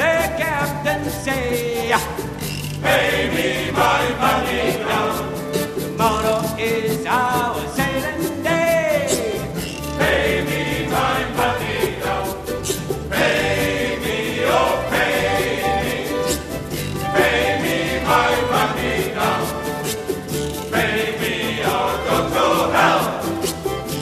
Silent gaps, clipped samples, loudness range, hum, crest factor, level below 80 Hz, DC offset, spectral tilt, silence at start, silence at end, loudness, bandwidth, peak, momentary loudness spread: none; under 0.1%; 2 LU; none; 18 dB; -38 dBFS; under 0.1%; -4 dB/octave; 0 s; 0 s; -20 LUFS; 14 kHz; 0 dBFS; 8 LU